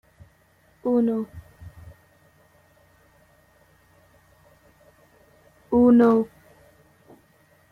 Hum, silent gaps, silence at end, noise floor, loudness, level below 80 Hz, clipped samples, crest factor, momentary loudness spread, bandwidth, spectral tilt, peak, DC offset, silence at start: none; none; 1.45 s; -60 dBFS; -21 LUFS; -58 dBFS; under 0.1%; 20 dB; 29 LU; 4.3 kHz; -9 dB/octave; -8 dBFS; under 0.1%; 0.85 s